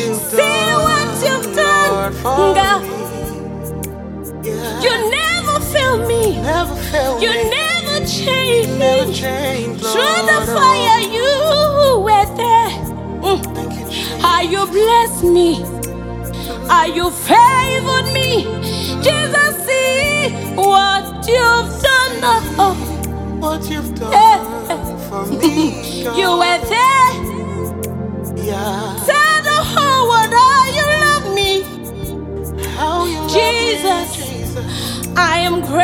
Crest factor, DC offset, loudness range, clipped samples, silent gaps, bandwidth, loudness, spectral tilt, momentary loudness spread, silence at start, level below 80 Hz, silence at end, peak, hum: 14 dB; under 0.1%; 4 LU; under 0.1%; none; 18 kHz; -14 LUFS; -3.5 dB/octave; 12 LU; 0 s; -34 dBFS; 0 s; 0 dBFS; none